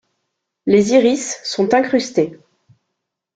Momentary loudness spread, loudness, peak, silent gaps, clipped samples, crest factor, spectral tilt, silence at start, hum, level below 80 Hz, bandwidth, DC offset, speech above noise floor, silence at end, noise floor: 10 LU; -16 LUFS; 0 dBFS; none; under 0.1%; 18 dB; -4.5 dB/octave; 0.65 s; none; -60 dBFS; 9.4 kHz; under 0.1%; 62 dB; 1 s; -77 dBFS